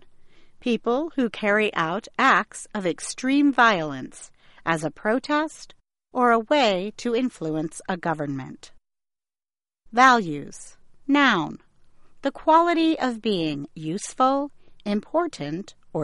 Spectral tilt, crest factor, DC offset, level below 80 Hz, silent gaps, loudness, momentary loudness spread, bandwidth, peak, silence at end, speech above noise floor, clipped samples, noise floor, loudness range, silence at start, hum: -4.5 dB/octave; 22 dB; under 0.1%; -58 dBFS; none; -23 LUFS; 15 LU; 11.5 kHz; -2 dBFS; 0 s; over 67 dB; under 0.1%; under -90 dBFS; 3 LU; 0.15 s; none